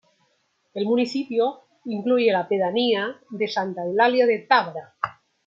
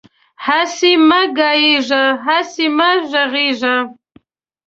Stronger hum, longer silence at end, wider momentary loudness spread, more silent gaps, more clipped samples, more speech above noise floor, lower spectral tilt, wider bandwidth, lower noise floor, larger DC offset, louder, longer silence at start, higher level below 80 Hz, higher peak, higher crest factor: neither; second, 0.35 s vs 0.75 s; first, 13 LU vs 6 LU; neither; neither; first, 46 dB vs 38 dB; first, -5.5 dB/octave vs -1.5 dB/octave; about the same, 7.6 kHz vs 7.8 kHz; first, -68 dBFS vs -51 dBFS; neither; second, -23 LUFS vs -13 LUFS; first, 0.75 s vs 0.4 s; second, -76 dBFS vs -62 dBFS; about the same, -2 dBFS vs 0 dBFS; first, 20 dB vs 14 dB